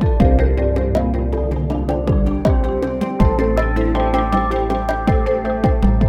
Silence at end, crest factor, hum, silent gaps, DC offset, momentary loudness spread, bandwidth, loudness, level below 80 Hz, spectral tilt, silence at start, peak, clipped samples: 0 s; 16 dB; none; none; under 0.1%; 5 LU; 7.4 kHz; -18 LUFS; -20 dBFS; -9 dB/octave; 0 s; 0 dBFS; under 0.1%